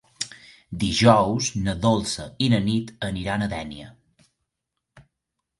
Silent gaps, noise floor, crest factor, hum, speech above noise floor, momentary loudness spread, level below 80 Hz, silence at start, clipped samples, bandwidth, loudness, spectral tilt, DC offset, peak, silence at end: none; -82 dBFS; 22 dB; none; 60 dB; 16 LU; -46 dBFS; 0.2 s; under 0.1%; 11.5 kHz; -23 LUFS; -5 dB/octave; under 0.1%; -2 dBFS; 0.6 s